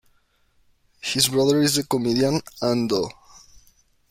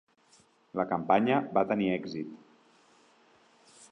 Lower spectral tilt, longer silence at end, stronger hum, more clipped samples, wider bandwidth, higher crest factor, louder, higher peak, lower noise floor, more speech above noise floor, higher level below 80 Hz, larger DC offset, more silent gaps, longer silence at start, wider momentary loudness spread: second, -4 dB/octave vs -7 dB/octave; first, 1 s vs 0.05 s; neither; neither; first, 16.5 kHz vs 10.5 kHz; about the same, 18 dB vs 22 dB; first, -21 LUFS vs -29 LUFS; first, -6 dBFS vs -10 dBFS; about the same, -63 dBFS vs -64 dBFS; first, 42 dB vs 35 dB; first, -56 dBFS vs -72 dBFS; neither; neither; first, 1.05 s vs 0.75 s; second, 8 LU vs 15 LU